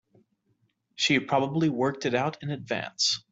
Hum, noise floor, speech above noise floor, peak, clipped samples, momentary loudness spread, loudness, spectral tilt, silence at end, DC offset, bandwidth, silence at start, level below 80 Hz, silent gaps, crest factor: none; -72 dBFS; 45 dB; -10 dBFS; under 0.1%; 8 LU; -27 LUFS; -4 dB/octave; 0.1 s; under 0.1%; 8.2 kHz; 1 s; -68 dBFS; none; 18 dB